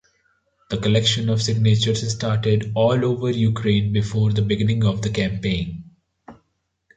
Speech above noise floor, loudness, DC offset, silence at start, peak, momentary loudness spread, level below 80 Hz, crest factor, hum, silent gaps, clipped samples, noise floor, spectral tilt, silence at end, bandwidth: 52 dB; -20 LUFS; under 0.1%; 0.7 s; -6 dBFS; 6 LU; -44 dBFS; 14 dB; none; none; under 0.1%; -71 dBFS; -6 dB/octave; 0.65 s; 9 kHz